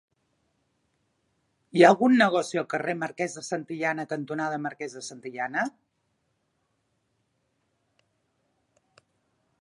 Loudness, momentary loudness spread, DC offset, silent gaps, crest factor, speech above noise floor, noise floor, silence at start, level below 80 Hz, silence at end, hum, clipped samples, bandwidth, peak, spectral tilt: -25 LUFS; 16 LU; under 0.1%; none; 26 dB; 50 dB; -75 dBFS; 1.75 s; -82 dBFS; 3.9 s; none; under 0.1%; 11.5 kHz; -2 dBFS; -5 dB/octave